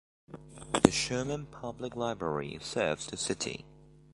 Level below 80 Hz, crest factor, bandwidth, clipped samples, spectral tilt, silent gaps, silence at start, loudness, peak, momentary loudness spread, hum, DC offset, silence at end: -56 dBFS; 32 dB; 11.5 kHz; under 0.1%; -4 dB/octave; none; 0.3 s; -32 LUFS; -2 dBFS; 20 LU; none; under 0.1%; 0.25 s